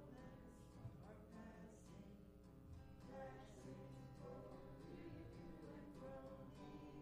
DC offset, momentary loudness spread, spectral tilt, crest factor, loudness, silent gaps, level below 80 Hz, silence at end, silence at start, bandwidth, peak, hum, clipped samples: under 0.1%; 5 LU; -7 dB/octave; 14 dB; -59 LUFS; none; -68 dBFS; 0 s; 0 s; 15 kHz; -44 dBFS; none; under 0.1%